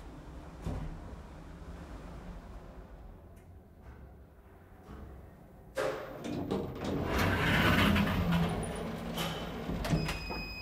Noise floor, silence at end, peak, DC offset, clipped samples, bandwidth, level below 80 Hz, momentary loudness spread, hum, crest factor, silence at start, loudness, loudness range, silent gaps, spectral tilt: -55 dBFS; 0 s; -14 dBFS; under 0.1%; under 0.1%; 16 kHz; -46 dBFS; 25 LU; none; 20 dB; 0 s; -33 LUFS; 21 LU; none; -5.5 dB/octave